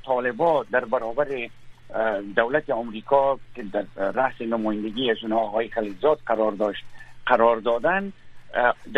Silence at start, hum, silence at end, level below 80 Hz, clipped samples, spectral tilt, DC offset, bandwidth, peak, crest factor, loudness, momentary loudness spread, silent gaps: 0.05 s; none; 0 s; -52 dBFS; under 0.1%; -6.5 dB/octave; under 0.1%; 6.6 kHz; -2 dBFS; 22 dB; -24 LUFS; 9 LU; none